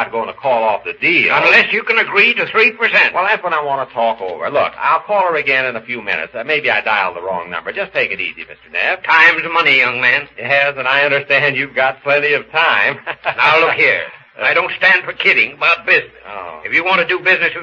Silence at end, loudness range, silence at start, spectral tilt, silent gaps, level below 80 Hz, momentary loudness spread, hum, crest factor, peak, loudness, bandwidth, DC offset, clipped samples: 0 s; 5 LU; 0 s; -4.5 dB/octave; none; -60 dBFS; 10 LU; none; 14 dB; 0 dBFS; -13 LUFS; 7.8 kHz; under 0.1%; under 0.1%